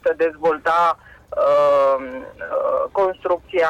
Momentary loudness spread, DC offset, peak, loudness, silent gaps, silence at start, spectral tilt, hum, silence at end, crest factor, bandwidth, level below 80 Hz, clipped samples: 14 LU; under 0.1%; -10 dBFS; -19 LUFS; none; 0.05 s; -5 dB/octave; none; 0 s; 10 dB; 9 kHz; -54 dBFS; under 0.1%